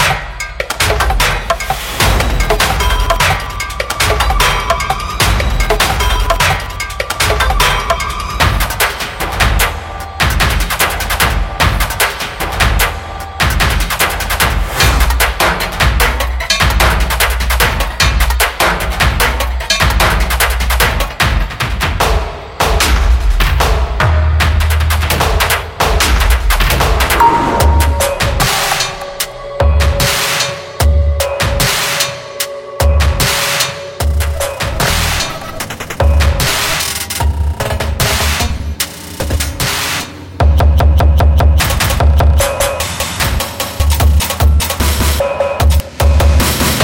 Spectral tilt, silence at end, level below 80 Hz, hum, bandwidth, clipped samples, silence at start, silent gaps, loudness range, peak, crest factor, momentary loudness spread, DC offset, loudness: -3.5 dB/octave; 0 s; -16 dBFS; none; 17 kHz; under 0.1%; 0 s; none; 3 LU; 0 dBFS; 12 dB; 7 LU; under 0.1%; -13 LUFS